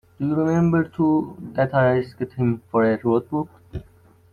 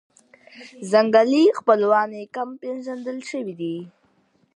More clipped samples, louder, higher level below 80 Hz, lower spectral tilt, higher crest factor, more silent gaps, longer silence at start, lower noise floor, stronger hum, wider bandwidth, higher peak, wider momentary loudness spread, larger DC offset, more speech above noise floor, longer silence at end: neither; about the same, -21 LUFS vs -21 LUFS; first, -52 dBFS vs -78 dBFS; first, -9 dB/octave vs -5.5 dB/octave; about the same, 16 dB vs 20 dB; neither; second, 0.2 s vs 0.55 s; second, -53 dBFS vs -63 dBFS; neither; second, 6.8 kHz vs 11 kHz; second, -6 dBFS vs -2 dBFS; about the same, 12 LU vs 14 LU; neither; second, 32 dB vs 42 dB; second, 0.5 s vs 0.7 s